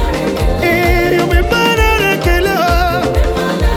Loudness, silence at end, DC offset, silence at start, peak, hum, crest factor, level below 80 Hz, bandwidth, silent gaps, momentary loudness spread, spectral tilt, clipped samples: -13 LUFS; 0 s; under 0.1%; 0 s; 0 dBFS; none; 12 dB; -18 dBFS; 17.5 kHz; none; 4 LU; -5.5 dB/octave; under 0.1%